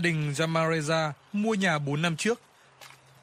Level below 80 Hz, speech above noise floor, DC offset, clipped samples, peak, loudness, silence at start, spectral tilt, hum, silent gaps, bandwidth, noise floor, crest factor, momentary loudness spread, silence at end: -68 dBFS; 25 dB; under 0.1%; under 0.1%; -12 dBFS; -27 LUFS; 0 s; -5 dB/octave; none; none; 15 kHz; -52 dBFS; 16 dB; 5 LU; 0.35 s